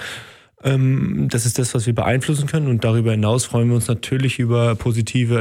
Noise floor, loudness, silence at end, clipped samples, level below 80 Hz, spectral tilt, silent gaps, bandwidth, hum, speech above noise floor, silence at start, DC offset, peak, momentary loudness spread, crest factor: -40 dBFS; -19 LUFS; 0 s; under 0.1%; -48 dBFS; -6 dB/octave; none; 15.5 kHz; none; 22 dB; 0 s; under 0.1%; -6 dBFS; 3 LU; 12 dB